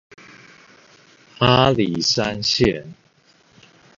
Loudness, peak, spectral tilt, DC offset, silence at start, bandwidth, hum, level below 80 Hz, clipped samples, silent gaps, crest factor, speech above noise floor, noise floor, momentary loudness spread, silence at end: -18 LUFS; 0 dBFS; -4.5 dB/octave; under 0.1%; 1.4 s; 7.6 kHz; none; -46 dBFS; under 0.1%; none; 22 dB; 38 dB; -56 dBFS; 5 LU; 1.05 s